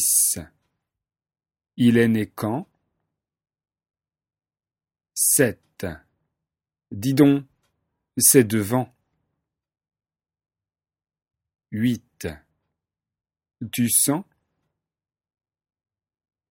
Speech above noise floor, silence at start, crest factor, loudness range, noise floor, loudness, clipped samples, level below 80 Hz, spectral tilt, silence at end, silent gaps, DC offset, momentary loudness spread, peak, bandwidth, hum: over 70 dB; 0 s; 24 dB; 12 LU; under -90 dBFS; -20 LUFS; under 0.1%; -60 dBFS; -4 dB/octave; 2.3 s; none; under 0.1%; 18 LU; -2 dBFS; 16.5 kHz; none